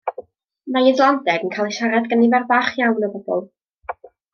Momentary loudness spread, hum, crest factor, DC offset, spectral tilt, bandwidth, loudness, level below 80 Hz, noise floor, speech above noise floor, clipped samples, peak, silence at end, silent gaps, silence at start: 20 LU; none; 18 dB; under 0.1%; -5 dB/octave; 6.8 kHz; -18 LUFS; -68 dBFS; -40 dBFS; 22 dB; under 0.1%; -2 dBFS; 0.25 s; 3.73-3.78 s; 0.05 s